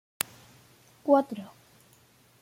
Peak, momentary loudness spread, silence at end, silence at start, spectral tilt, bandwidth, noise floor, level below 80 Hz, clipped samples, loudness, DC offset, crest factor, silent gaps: 0 dBFS; 17 LU; 0.95 s; 1.05 s; -4 dB/octave; 16.5 kHz; -61 dBFS; -76 dBFS; under 0.1%; -28 LUFS; under 0.1%; 32 dB; none